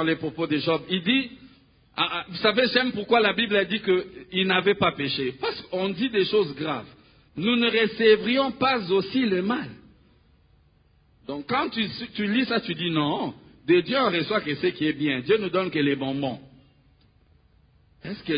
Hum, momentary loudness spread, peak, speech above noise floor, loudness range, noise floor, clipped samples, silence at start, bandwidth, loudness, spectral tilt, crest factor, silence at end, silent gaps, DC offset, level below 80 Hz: none; 10 LU; -4 dBFS; 37 dB; 5 LU; -61 dBFS; under 0.1%; 0 s; 5.2 kHz; -24 LUFS; -9.5 dB/octave; 20 dB; 0 s; none; under 0.1%; -60 dBFS